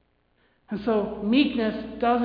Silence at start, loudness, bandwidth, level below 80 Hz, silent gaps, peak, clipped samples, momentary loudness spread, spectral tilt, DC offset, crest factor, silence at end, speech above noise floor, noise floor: 0.7 s; -25 LUFS; 5.2 kHz; -54 dBFS; none; -8 dBFS; under 0.1%; 8 LU; -8.5 dB/octave; under 0.1%; 16 dB; 0 s; 42 dB; -66 dBFS